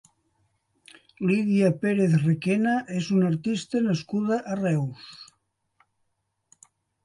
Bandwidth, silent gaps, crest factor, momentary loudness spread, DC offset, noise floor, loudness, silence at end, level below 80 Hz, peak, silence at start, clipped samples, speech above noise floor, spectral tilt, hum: 11.5 kHz; none; 18 dB; 8 LU; under 0.1%; -76 dBFS; -25 LUFS; 1.8 s; -68 dBFS; -8 dBFS; 1.2 s; under 0.1%; 52 dB; -7.5 dB/octave; none